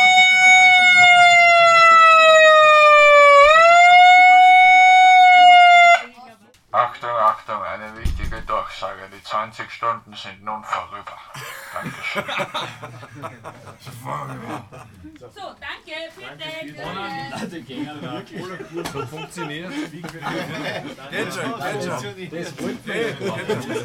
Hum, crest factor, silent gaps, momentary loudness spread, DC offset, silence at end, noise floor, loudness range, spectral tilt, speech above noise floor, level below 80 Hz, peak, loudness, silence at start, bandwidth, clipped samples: none; 14 dB; none; 23 LU; under 0.1%; 0 s; -47 dBFS; 23 LU; -2.5 dB/octave; 18 dB; -42 dBFS; -2 dBFS; -11 LUFS; 0 s; 14 kHz; under 0.1%